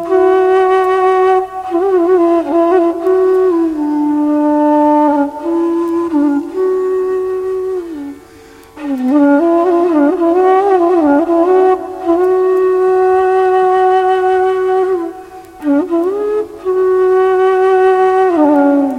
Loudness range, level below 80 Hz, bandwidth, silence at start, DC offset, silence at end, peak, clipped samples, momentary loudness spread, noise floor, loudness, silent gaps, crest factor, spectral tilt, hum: 4 LU; -50 dBFS; 9 kHz; 0 s; under 0.1%; 0 s; 0 dBFS; under 0.1%; 8 LU; -38 dBFS; -12 LUFS; none; 12 dB; -6 dB/octave; none